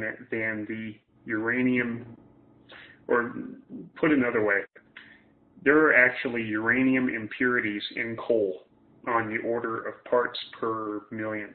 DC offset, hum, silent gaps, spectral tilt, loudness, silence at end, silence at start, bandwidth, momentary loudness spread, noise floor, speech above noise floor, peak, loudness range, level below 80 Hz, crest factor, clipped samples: under 0.1%; none; none; -9.5 dB/octave; -26 LUFS; 0 s; 0 s; 4.5 kHz; 16 LU; -57 dBFS; 30 dB; -8 dBFS; 6 LU; -66 dBFS; 20 dB; under 0.1%